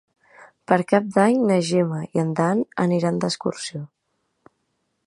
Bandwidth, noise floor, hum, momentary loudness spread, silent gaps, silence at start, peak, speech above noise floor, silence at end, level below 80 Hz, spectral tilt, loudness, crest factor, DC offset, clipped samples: 11.5 kHz; -73 dBFS; none; 12 LU; none; 0.7 s; -2 dBFS; 52 dB; 1.2 s; -68 dBFS; -6 dB/octave; -21 LUFS; 20 dB; under 0.1%; under 0.1%